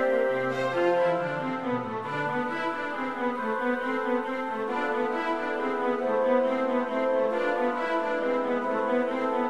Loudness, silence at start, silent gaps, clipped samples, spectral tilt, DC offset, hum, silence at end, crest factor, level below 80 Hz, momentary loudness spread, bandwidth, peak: -27 LUFS; 0 s; none; under 0.1%; -6 dB/octave; 0.3%; none; 0 s; 14 dB; -68 dBFS; 6 LU; 10 kHz; -12 dBFS